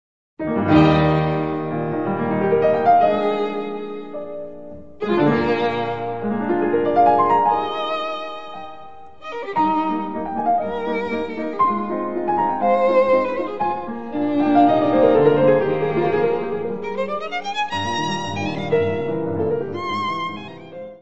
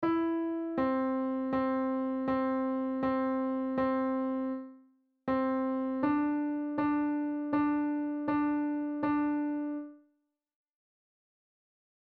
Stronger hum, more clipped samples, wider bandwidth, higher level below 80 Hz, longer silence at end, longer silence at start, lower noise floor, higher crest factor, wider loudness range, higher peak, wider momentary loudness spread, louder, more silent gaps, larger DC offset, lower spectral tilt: neither; neither; first, 8 kHz vs 4.6 kHz; first, -48 dBFS vs -66 dBFS; second, 0 s vs 2.05 s; first, 0.35 s vs 0 s; second, -41 dBFS vs -77 dBFS; about the same, 18 dB vs 14 dB; about the same, 5 LU vs 3 LU; first, 0 dBFS vs -18 dBFS; first, 16 LU vs 4 LU; first, -20 LUFS vs -32 LUFS; neither; first, 1% vs under 0.1%; second, -7 dB/octave vs -9 dB/octave